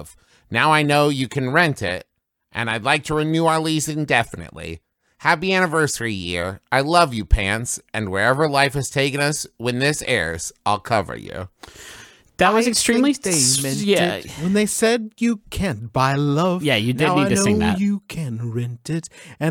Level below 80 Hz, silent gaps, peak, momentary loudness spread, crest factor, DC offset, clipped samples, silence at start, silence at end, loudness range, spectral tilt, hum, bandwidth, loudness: -36 dBFS; none; 0 dBFS; 12 LU; 20 dB; under 0.1%; under 0.1%; 0 s; 0 s; 3 LU; -4 dB/octave; none; 19 kHz; -19 LUFS